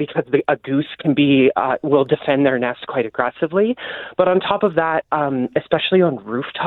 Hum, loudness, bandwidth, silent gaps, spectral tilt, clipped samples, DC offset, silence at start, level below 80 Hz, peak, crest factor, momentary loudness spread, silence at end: none; -18 LUFS; 4.2 kHz; none; -9.5 dB/octave; under 0.1%; under 0.1%; 0 s; -60 dBFS; -2 dBFS; 16 dB; 7 LU; 0 s